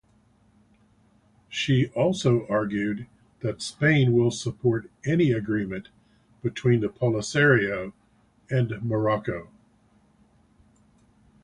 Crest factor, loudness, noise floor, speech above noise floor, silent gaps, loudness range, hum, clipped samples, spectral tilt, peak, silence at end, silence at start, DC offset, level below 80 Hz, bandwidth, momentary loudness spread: 20 dB; -25 LUFS; -62 dBFS; 38 dB; none; 5 LU; none; under 0.1%; -6.5 dB/octave; -6 dBFS; 2 s; 1.5 s; under 0.1%; -56 dBFS; 11 kHz; 13 LU